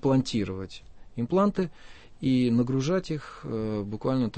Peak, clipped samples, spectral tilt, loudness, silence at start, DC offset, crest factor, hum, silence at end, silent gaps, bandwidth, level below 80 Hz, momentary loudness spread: -12 dBFS; under 0.1%; -7 dB/octave; -28 LUFS; 0 s; under 0.1%; 14 dB; none; 0 s; none; 8.6 kHz; -52 dBFS; 12 LU